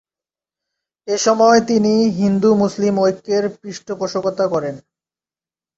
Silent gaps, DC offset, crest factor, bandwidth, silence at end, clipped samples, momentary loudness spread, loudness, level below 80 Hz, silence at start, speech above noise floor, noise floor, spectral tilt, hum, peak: none; under 0.1%; 16 dB; 8 kHz; 0.95 s; under 0.1%; 16 LU; -16 LUFS; -58 dBFS; 1.05 s; over 74 dB; under -90 dBFS; -5.5 dB/octave; none; -2 dBFS